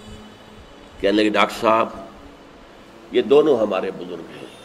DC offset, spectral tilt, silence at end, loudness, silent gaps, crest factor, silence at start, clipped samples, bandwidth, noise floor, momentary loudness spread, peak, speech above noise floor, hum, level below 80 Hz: under 0.1%; -5 dB/octave; 0.1 s; -19 LUFS; none; 22 dB; 0 s; under 0.1%; 14.5 kHz; -44 dBFS; 22 LU; 0 dBFS; 26 dB; none; -52 dBFS